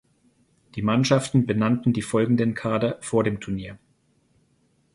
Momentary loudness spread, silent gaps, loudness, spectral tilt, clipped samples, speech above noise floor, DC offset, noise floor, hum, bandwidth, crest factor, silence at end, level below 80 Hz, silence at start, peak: 11 LU; none; -23 LUFS; -6.5 dB/octave; under 0.1%; 43 dB; under 0.1%; -65 dBFS; none; 11.5 kHz; 18 dB; 1.2 s; -54 dBFS; 0.75 s; -6 dBFS